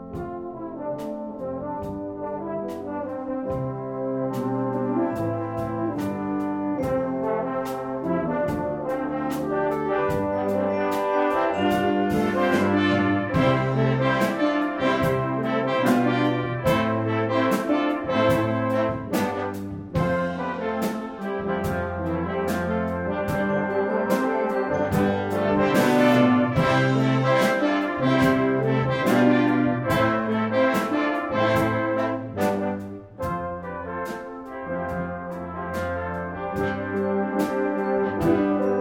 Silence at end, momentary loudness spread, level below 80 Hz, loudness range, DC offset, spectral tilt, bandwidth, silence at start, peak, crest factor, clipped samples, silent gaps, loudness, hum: 0 s; 11 LU; -50 dBFS; 9 LU; under 0.1%; -7 dB/octave; 17.5 kHz; 0 s; -6 dBFS; 18 dB; under 0.1%; none; -24 LUFS; none